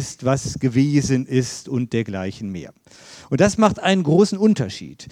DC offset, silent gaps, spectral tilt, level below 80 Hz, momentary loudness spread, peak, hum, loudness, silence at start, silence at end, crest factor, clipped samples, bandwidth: under 0.1%; none; -6 dB/octave; -48 dBFS; 12 LU; -2 dBFS; none; -19 LUFS; 0 s; 0 s; 18 dB; under 0.1%; 12.5 kHz